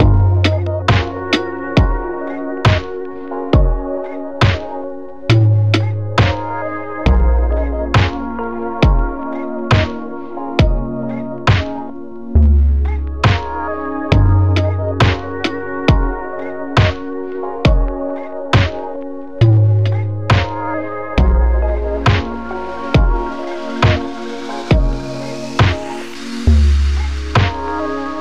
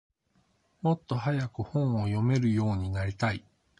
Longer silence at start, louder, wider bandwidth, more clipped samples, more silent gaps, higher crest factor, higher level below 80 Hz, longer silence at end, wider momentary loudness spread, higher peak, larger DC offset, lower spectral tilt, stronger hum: second, 0 s vs 0.85 s; first, -17 LUFS vs -29 LUFS; second, 8.4 kHz vs 10 kHz; neither; neither; about the same, 14 dB vs 18 dB; first, -20 dBFS vs -50 dBFS; second, 0 s vs 0.4 s; first, 12 LU vs 6 LU; first, -2 dBFS vs -12 dBFS; first, 2% vs under 0.1%; about the same, -7 dB/octave vs -8 dB/octave; neither